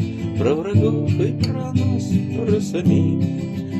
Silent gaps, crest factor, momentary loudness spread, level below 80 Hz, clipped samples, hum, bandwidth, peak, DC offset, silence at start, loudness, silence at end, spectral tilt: none; 14 dB; 5 LU; -50 dBFS; under 0.1%; none; 12 kHz; -4 dBFS; under 0.1%; 0 s; -20 LUFS; 0 s; -8 dB/octave